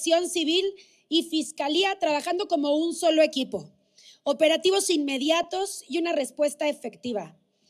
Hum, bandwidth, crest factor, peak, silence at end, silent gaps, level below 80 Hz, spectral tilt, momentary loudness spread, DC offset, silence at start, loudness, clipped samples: none; 14 kHz; 16 dB; -10 dBFS; 0.4 s; none; -76 dBFS; -2 dB/octave; 11 LU; under 0.1%; 0 s; -25 LUFS; under 0.1%